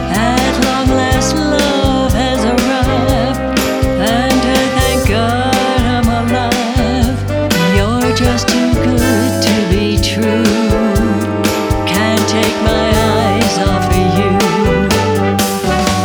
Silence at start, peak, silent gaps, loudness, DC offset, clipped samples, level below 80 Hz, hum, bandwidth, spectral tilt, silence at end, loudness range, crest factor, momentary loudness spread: 0 s; 0 dBFS; none; -13 LUFS; under 0.1%; under 0.1%; -24 dBFS; none; over 20 kHz; -5 dB/octave; 0 s; 1 LU; 12 dB; 2 LU